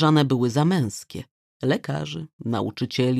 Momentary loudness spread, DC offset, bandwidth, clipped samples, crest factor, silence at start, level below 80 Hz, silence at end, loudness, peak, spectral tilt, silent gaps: 14 LU; under 0.1%; 14 kHz; under 0.1%; 18 dB; 0 s; -62 dBFS; 0 s; -24 LUFS; -6 dBFS; -6.5 dB/octave; 1.31-1.60 s, 2.33-2.39 s